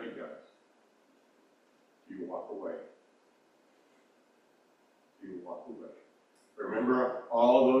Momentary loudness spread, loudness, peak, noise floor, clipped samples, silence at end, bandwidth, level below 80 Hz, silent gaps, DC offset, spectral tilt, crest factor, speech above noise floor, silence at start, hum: 26 LU; -31 LUFS; -12 dBFS; -67 dBFS; under 0.1%; 0 s; 6.4 kHz; -80 dBFS; none; under 0.1%; -7 dB/octave; 22 dB; 40 dB; 0 s; none